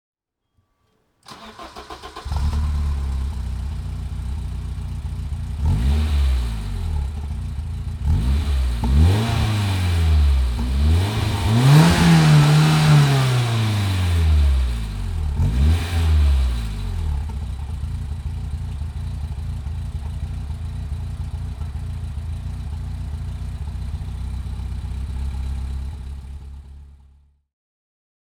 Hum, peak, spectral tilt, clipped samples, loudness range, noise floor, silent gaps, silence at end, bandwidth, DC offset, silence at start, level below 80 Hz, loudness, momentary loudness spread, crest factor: none; -2 dBFS; -6 dB/octave; under 0.1%; 14 LU; -69 dBFS; none; 1.4 s; 17.5 kHz; under 0.1%; 1.3 s; -24 dBFS; -21 LUFS; 15 LU; 20 dB